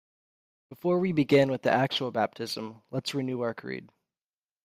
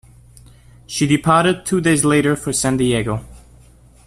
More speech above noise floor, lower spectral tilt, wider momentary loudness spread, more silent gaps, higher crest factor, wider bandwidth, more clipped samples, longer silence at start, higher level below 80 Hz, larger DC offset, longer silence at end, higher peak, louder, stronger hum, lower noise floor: first, over 62 dB vs 31 dB; first, -6 dB/octave vs -4.5 dB/octave; first, 13 LU vs 9 LU; neither; about the same, 20 dB vs 18 dB; first, 15.5 kHz vs 14 kHz; neither; second, 0.7 s vs 0.9 s; second, -70 dBFS vs -44 dBFS; neither; about the same, 0.8 s vs 0.7 s; second, -10 dBFS vs -2 dBFS; second, -28 LUFS vs -17 LUFS; neither; first, under -90 dBFS vs -47 dBFS